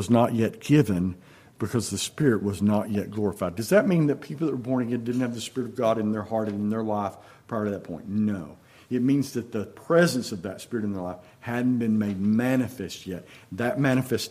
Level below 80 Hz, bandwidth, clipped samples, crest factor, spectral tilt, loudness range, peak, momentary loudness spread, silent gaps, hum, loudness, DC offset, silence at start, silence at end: -64 dBFS; 15.5 kHz; under 0.1%; 20 dB; -6 dB/octave; 3 LU; -6 dBFS; 13 LU; none; none; -26 LUFS; under 0.1%; 0 s; 0 s